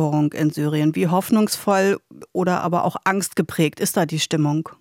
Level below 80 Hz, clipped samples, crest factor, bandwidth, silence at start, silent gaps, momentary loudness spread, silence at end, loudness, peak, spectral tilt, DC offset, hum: -66 dBFS; under 0.1%; 16 dB; 17 kHz; 0 s; none; 4 LU; 0.05 s; -20 LUFS; -4 dBFS; -5.5 dB/octave; under 0.1%; none